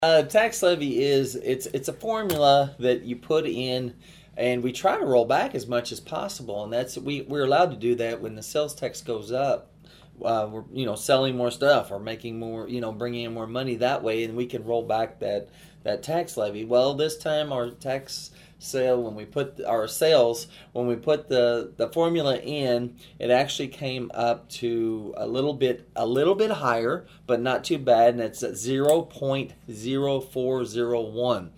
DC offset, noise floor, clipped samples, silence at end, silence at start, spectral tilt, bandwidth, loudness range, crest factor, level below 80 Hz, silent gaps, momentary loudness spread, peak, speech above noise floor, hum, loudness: under 0.1%; -51 dBFS; under 0.1%; 0.05 s; 0 s; -5 dB/octave; 16 kHz; 4 LU; 20 dB; -60 dBFS; none; 11 LU; -4 dBFS; 26 dB; none; -25 LUFS